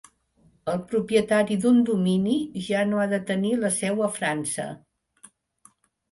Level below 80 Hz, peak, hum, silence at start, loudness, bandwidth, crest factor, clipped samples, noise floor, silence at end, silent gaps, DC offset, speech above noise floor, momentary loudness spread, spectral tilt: -62 dBFS; -8 dBFS; none; 0.65 s; -24 LUFS; 11.5 kHz; 18 dB; under 0.1%; -62 dBFS; 1.35 s; none; under 0.1%; 39 dB; 10 LU; -5 dB/octave